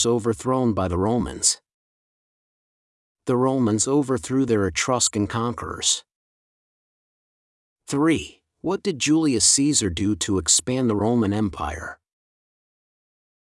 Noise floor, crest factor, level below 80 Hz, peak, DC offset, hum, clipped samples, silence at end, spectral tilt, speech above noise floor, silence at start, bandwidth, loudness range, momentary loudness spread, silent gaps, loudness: under -90 dBFS; 22 dB; -50 dBFS; -2 dBFS; under 0.1%; none; under 0.1%; 1.55 s; -3.5 dB/octave; over 68 dB; 0 s; 12 kHz; 6 LU; 10 LU; 1.74-3.15 s, 6.15-7.76 s; -21 LUFS